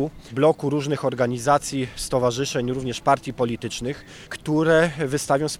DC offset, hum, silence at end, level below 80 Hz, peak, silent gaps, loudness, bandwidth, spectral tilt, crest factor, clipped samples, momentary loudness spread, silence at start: under 0.1%; none; 0 s; -48 dBFS; -4 dBFS; none; -23 LUFS; 15.5 kHz; -5 dB/octave; 18 dB; under 0.1%; 10 LU; 0 s